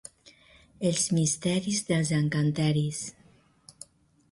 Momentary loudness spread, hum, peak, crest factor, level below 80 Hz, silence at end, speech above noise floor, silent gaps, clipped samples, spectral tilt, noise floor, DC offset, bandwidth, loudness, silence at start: 22 LU; none; -14 dBFS; 16 dB; -62 dBFS; 1.2 s; 34 dB; none; under 0.1%; -4.5 dB/octave; -60 dBFS; under 0.1%; 11.5 kHz; -27 LUFS; 0.25 s